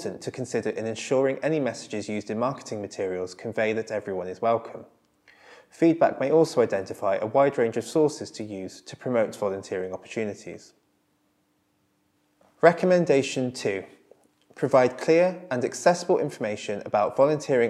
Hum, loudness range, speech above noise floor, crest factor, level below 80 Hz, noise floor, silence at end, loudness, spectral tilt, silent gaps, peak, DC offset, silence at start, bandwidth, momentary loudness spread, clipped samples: none; 8 LU; 45 dB; 24 dB; -76 dBFS; -70 dBFS; 0 s; -25 LUFS; -5.5 dB/octave; none; -2 dBFS; under 0.1%; 0 s; 12.5 kHz; 13 LU; under 0.1%